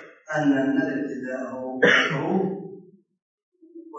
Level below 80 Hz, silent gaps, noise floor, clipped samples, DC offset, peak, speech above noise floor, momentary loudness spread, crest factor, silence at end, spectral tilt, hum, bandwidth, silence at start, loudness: -76 dBFS; 3.22-3.52 s; -47 dBFS; under 0.1%; under 0.1%; -6 dBFS; 25 dB; 14 LU; 20 dB; 0 s; -5.5 dB/octave; none; 7.8 kHz; 0 s; -23 LUFS